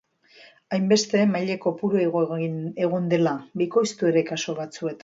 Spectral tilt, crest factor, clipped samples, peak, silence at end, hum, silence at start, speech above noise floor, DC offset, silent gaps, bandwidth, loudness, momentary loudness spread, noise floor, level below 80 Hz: -5.5 dB/octave; 16 dB; under 0.1%; -8 dBFS; 0.05 s; none; 0.7 s; 30 dB; under 0.1%; none; 8 kHz; -24 LUFS; 8 LU; -53 dBFS; -72 dBFS